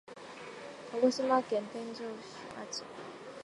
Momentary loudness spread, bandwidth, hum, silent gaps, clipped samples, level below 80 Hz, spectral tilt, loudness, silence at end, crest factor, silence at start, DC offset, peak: 17 LU; 11 kHz; none; none; under 0.1%; -80 dBFS; -4 dB/octave; -34 LUFS; 0 s; 22 dB; 0.05 s; under 0.1%; -14 dBFS